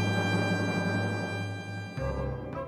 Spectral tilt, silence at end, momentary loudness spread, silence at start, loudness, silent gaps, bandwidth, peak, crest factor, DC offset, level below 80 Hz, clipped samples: -6 dB/octave; 0 s; 8 LU; 0 s; -31 LUFS; none; 12.5 kHz; -16 dBFS; 14 dB; under 0.1%; -46 dBFS; under 0.1%